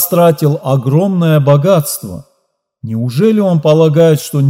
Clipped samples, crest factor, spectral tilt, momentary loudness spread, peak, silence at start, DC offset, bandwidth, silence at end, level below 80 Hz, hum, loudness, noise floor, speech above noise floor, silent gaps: 0.1%; 10 dB; -7 dB/octave; 13 LU; 0 dBFS; 0 s; under 0.1%; 16.5 kHz; 0 s; -56 dBFS; none; -11 LUFS; -64 dBFS; 54 dB; none